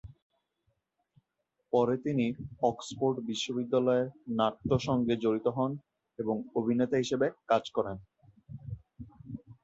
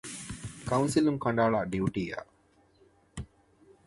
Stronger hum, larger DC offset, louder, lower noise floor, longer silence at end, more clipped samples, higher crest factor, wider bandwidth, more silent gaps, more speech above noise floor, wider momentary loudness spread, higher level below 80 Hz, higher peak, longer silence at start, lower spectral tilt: neither; neither; about the same, -31 LUFS vs -30 LUFS; first, -82 dBFS vs -64 dBFS; second, 0.1 s vs 0.6 s; neither; about the same, 18 dB vs 20 dB; second, 8.2 kHz vs 11.5 kHz; first, 0.22-0.30 s vs none; first, 52 dB vs 36 dB; about the same, 17 LU vs 19 LU; second, -60 dBFS vs -54 dBFS; about the same, -12 dBFS vs -12 dBFS; about the same, 0.05 s vs 0.05 s; about the same, -6.5 dB/octave vs -6 dB/octave